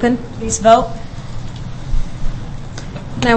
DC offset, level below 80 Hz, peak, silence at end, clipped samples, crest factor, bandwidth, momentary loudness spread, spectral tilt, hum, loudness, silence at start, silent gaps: under 0.1%; -24 dBFS; 0 dBFS; 0 s; under 0.1%; 16 dB; 8.8 kHz; 18 LU; -4.5 dB/octave; none; -18 LUFS; 0 s; none